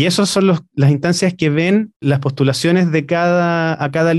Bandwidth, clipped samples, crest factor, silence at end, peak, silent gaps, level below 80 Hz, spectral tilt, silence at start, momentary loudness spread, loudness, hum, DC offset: 12.5 kHz; under 0.1%; 12 dB; 0 s; -4 dBFS; 1.96-2.00 s; -56 dBFS; -6 dB/octave; 0 s; 4 LU; -15 LUFS; none; under 0.1%